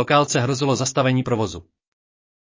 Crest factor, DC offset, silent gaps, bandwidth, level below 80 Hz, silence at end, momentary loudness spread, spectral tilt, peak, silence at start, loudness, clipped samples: 18 dB; under 0.1%; none; 7.6 kHz; -50 dBFS; 1 s; 9 LU; -5 dB/octave; -4 dBFS; 0 s; -20 LUFS; under 0.1%